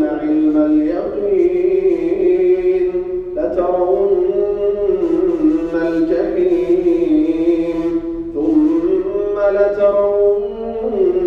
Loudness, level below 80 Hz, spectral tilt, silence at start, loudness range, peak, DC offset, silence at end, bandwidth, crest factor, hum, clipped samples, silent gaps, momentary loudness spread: -16 LUFS; -40 dBFS; -8.5 dB/octave; 0 s; 1 LU; -2 dBFS; under 0.1%; 0 s; 5.8 kHz; 12 dB; none; under 0.1%; none; 6 LU